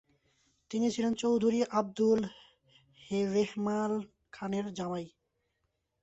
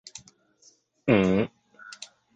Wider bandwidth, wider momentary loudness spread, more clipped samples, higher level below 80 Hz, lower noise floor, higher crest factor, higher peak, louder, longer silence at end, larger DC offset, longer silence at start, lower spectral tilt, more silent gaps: about the same, 8.2 kHz vs 9 kHz; second, 12 LU vs 24 LU; neither; second, -70 dBFS vs -56 dBFS; first, -81 dBFS vs -61 dBFS; second, 16 dB vs 22 dB; second, -16 dBFS vs -6 dBFS; second, -32 LUFS vs -25 LUFS; first, 0.95 s vs 0.3 s; neither; second, 0.7 s vs 1.05 s; about the same, -6 dB/octave vs -6.5 dB/octave; neither